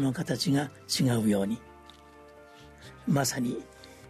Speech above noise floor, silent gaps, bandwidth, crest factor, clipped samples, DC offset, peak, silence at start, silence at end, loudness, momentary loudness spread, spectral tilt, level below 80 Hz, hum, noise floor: 24 dB; none; 13.5 kHz; 16 dB; under 0.1%; under 0.1%; -14 dBFS; 0 s; 0 s; -29 LUFS; 17 LU; -5 dB/octave; -60 dBFS; none; -52 dBFS